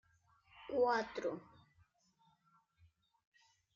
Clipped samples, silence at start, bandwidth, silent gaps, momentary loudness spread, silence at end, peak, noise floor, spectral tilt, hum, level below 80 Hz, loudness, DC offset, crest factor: under 0.1%; 0.55 s; 7.2 kHz; none; 17 LU; 2.35 s; -24 dBFS; -75 dBFS; -2.5 dB/octave; none; -80 dBFS; -38 LUFS; under 0.1%; 20 dB